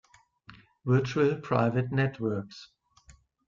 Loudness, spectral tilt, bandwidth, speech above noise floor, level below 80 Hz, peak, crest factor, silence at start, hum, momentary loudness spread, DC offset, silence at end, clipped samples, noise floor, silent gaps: -28 LUFS; -8 dB/octave; 7.4 kHz; 31 dB; -62 dBFS; -12 dBFS; 18 dB; 0.5 s; none; 13 LU; under 0.1%; 0.35 s; under 0.1%; -59 dBFS; none